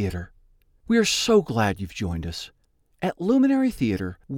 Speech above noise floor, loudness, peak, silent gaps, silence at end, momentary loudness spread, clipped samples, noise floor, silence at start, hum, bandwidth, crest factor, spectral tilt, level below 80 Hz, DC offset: 35 dB; -23 LUFS; -8 dBFS; none; 0 s; 15 LU; under 0.1%; -58 dBFS; 0 s; none; 16.5 kHz; 16 dB; -5 dB/octave; -46 dBFS; under 0.1%